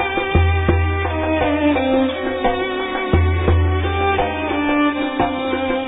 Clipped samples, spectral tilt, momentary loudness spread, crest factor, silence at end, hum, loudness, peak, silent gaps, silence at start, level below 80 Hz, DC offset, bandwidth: under 0.1%; -10.5 dB/octave; 4 LU; 16 dB; 0 s; none; -18 LUFS; 0 dBFS; none; 0 s; -28 dBFS; under 0.1%; 3.9 kHz